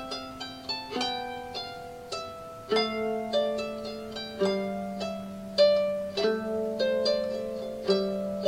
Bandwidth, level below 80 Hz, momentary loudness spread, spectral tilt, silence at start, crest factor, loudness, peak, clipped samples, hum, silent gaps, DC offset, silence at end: 16 kHz; -60 dBFS; 11 LU; -4.5 dB/octave; 0 s; 20 dB; -30 LUFS; -10 dBFS; under 0.1%; none; none; under 0.1%; 0 s